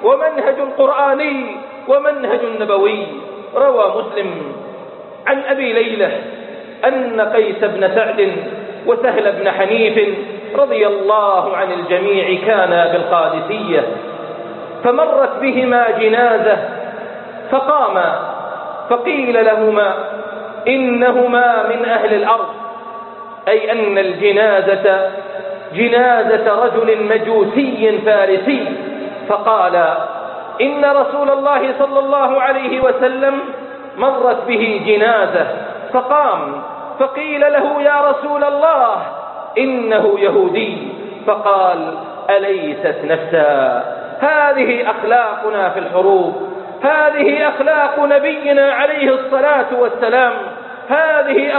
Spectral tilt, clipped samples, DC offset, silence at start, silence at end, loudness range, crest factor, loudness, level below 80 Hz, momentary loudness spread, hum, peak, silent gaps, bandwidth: -10 dB/octave; under 0.1%; under 0.1%; 0 s; 0 s; 3 LU; 14 dB; -14 LUFS; -62 dBFS; 13 LU; none; 0 dBFS; none; 4.3 kHz